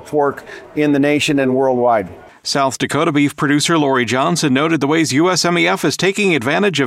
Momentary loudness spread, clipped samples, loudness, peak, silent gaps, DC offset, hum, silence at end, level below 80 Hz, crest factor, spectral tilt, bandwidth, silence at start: 5 LU; under 0.1%; -15 LUFS; -2 dBFS; none; under 0.1%; none; 0 s; -56 dBFS; 14 dB; -4.5 dB/octave; 15 kHz; 0 s